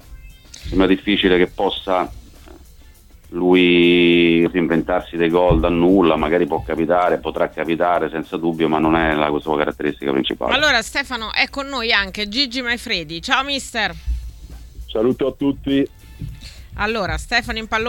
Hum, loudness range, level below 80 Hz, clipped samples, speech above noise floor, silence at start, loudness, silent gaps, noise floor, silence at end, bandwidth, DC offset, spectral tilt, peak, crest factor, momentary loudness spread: none; 6 LU; -36 dBFS; under 0.1%; 27 dB; 0.1 s; -18 LUFS; none; -44 dBFS; 0 s; 17 kHz; under 0.1%; -5 dB/octave; 0 dBFS; 18 dB; 10 LU